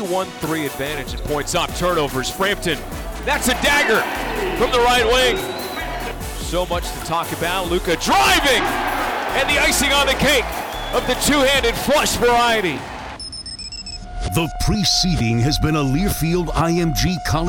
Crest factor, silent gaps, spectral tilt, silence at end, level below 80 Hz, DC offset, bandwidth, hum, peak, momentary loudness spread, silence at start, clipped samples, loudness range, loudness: 14 dB; none; -3.5 dB/octave; 0 s; -30 dBFS; under 0.1%; over 20 kHz; none; -4 dBFS; 12 LU; 0 s; under 0.1%; 4 LU; -18 LUFS